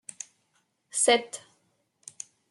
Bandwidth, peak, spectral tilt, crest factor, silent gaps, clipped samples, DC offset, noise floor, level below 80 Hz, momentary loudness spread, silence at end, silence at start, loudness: 12.5 kHz; -10 dBFS; 0 dB/octave; 22 dB; none; under 0.1%; under 0.1%; -73 dBFS; -86 dBFS; 24 LU; 1.1 s; 0.95 s; -24 LUFS